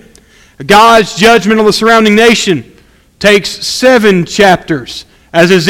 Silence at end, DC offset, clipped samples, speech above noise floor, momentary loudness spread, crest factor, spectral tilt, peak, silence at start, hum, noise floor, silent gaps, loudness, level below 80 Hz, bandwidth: 0 s; under 0.1%; 3%; 35 dB; 12 LU; 8 dB; -4 dB/octave; 0 dBFS; 0.6 s; none; -41 dBFS; none; -7 LUFS; -38 dBFS; 17 kHz